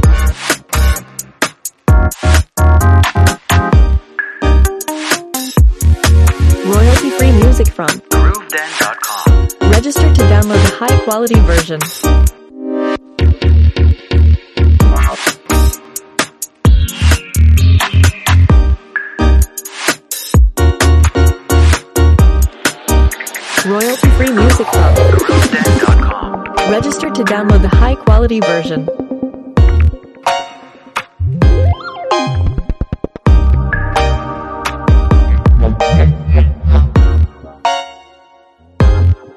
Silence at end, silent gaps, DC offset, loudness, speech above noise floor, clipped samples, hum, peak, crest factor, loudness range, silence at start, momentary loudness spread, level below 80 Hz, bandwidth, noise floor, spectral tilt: 0.2 s; none; under 0.1%; -12 LUFS; 35 dB; under 0.1%; none; 0 dBFS; 10 dB; 3 LU; 0 s; 9 LU; -12 dBFS; 13.5 kHz; -45 dBFS; -5.5 dB/octave